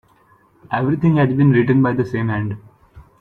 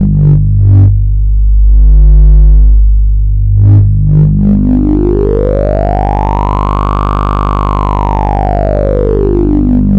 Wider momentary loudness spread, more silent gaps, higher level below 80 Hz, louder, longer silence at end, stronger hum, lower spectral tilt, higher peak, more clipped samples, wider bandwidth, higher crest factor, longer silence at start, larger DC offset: first, 11 LU vs 6 LU; neither; second, -50 dBFS vs -8 dBFS; second, -17 LUFS vs -9 LUFS; first, 0.2 s vs 0 s; second, none vs 50 Hz at -10 dBFS; about the same, -10 dB/octave vs -11 dB/octave; second, -4 dBFS vs 0 dBFS; neither; first, 5.4 kHz vs 3.6 kHz; first, 14 dB vs 6 dB; first, 0.7 s vs 0 s; second, under 0.1% vs 0.6%